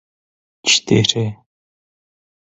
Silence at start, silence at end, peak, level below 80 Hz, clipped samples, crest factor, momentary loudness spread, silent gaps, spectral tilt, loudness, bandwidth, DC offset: 0.65 s; 1.2 s; 0 dBFS; -52 dBFS; under 0.1%; 22 dB; 10 LU; none; -3.5 dB/octave; -16 LUFS; 8.4 kHz; under 0.1%